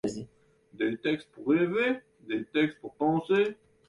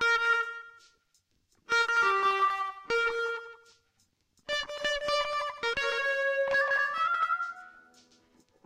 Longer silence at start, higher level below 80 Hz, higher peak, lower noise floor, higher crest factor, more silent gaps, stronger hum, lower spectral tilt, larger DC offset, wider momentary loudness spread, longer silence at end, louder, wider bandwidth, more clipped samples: about the same, 0.05 s vs 0 s; about the same, -68 dBFS vs -64 dBFS; about the same, -14 dBFS vs -16 dBFS; second, -60 dBFS vs -73 dBFS; about the same, 16 dB vs 14 dB; neither; neither; first, -6.5 dB/octave vs -1 dB/octave; neither; about the same, 10 LU vs 12 LU; second, 0.35 s vs 0.95 s; about the same, -29 LUFS vs -28 LUFS; second, 11 kHz vs 15 kHz; neither